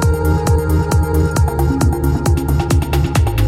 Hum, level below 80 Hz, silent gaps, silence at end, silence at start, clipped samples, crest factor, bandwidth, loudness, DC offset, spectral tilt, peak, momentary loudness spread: none; -18 dBFS; none; 0 s; 0 s; under 0.1%; 12 dB; 16 kHz; -16 LUFS; under 0.1%; -6.5 dB/octave; -2 dBFS; 1 LU